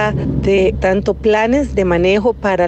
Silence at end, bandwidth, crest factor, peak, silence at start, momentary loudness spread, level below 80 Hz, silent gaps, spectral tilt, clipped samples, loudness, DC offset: 0 s; 8.6 kHz; 10 dB; -4 dBFS; 0 s; 3 LU; -28 dBFS; none; -7 dB/octave; under 0.1%; -14 LUFS; under 0.1%